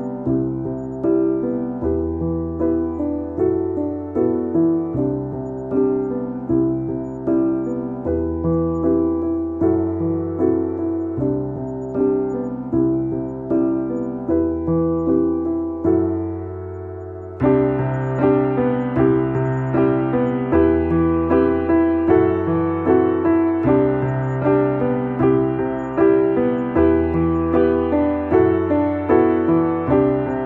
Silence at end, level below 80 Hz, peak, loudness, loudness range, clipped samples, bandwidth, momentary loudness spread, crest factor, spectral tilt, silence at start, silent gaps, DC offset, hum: 0 s; -42 dBFS; -4 dBFS; -19 LUFS; 4 LU; under 0.1%; 3.5 kHz; 8 LU; 16 dB; -11 dB/octave; 0 s; none; under 0.1%; none